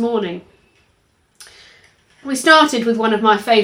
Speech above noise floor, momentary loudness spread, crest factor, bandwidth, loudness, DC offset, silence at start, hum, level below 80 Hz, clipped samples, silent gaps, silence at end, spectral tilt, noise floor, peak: 45 dB; 18 LU; 18 dB; 17 kHz; -15 LUFS; under 0.1%; 0 s; none; -62 dBFS; under 0.1%; none; 0 s; -3 dB/octave; -60 dBFS; 0 dBFS